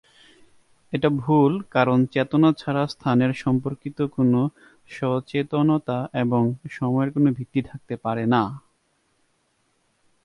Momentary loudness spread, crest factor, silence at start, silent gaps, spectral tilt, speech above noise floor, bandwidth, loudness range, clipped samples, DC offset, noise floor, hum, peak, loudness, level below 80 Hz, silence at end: 9 LU; 18 dB; 0.9 s; none; -8.5 dB/octave; 46 dB; 11 kHz; 4 LU; under 0.1%; under 0.1%; -68 dBFS; none; -6 dBFS; -23 LUFS; -58 dBFS; 1.65 s